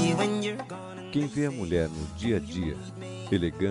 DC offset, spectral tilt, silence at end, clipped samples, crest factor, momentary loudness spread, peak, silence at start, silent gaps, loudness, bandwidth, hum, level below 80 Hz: under 0.1%; -6 dB/octave; 0 s; under 0.1%; 16 dB; 12 LU; -12 dBFS; 0 s; none; -30 LUFS; 11.5 kHz; none; -50 dBFS